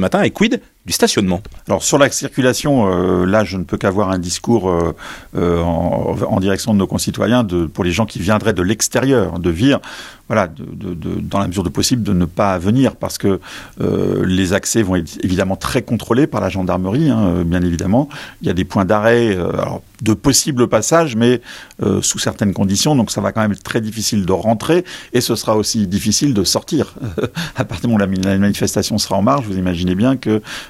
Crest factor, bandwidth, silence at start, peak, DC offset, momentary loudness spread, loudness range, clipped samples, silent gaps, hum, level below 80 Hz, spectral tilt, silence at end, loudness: 16 dB; 16 kHz; 0 s; 0 dBFS; under 0.1%; 7 LU; 2 LU; under 0.1%; none; none; -42 dBFS; -5 dB/octave; 0 s; -16 LUFS